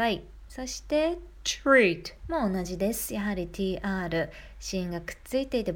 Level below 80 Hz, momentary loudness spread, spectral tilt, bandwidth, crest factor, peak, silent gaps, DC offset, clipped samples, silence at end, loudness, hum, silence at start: -46 dBFS; 15 LU; -4.5 dB/octave; 19 kHz; 20 dB; -8 dBFS; none; under 0.1%; under 0.1%; 0 s; -29 LUFS; none; 0 s